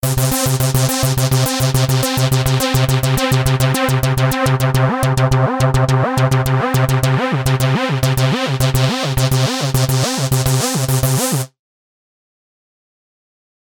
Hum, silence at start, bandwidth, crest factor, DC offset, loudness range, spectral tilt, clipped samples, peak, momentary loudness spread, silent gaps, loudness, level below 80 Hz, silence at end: none; 0.05 s; 19.5 kHz; 16 dB; under 0.1%; 3 LU; -5 dB/octave; under 0.1%; 0 dBFS; 2 LU; none; -15 LUFS; -34 dBFS; 2.25 s